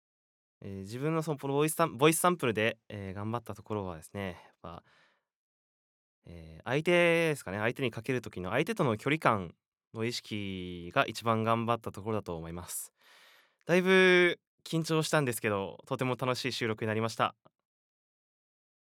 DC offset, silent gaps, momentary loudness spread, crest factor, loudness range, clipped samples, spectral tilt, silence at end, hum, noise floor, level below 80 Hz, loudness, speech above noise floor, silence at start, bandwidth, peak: under 0.1%; 5.36-6.22 s, 9.68-9.72 s, 9.87-9.91 s, 14.47-14.58 s; 17 LU; 24 dB; 8 LU; under 0.1%; -5 dB/octave; 1.5 s; none; -62 dBFS; -72 dBFS; -30 LUFS; 31 dB; 0.65 s; 17.5 kHz; -8 dBFS